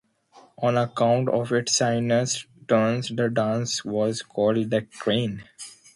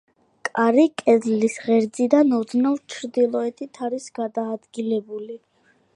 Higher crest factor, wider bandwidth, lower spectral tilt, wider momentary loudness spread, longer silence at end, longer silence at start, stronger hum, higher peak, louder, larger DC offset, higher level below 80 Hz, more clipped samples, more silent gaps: about the same, 16 dB vs 18 dB; about the same, 11.5 kHz vs 11 kHz; about the same, -4.5 dB/octave vs -5.5 dB/octave; second, 6 LU vs 13 LU; second, 0.25 s vs 0.6 s; about the same, 0.35 s vs 0.45 s; neither; second, -8 dBFS vs -2 dBFS; about the same, -24 LUFS vs -22 LUFS; neither; first, -62 dBFS vs -76 dBFS; neither; neither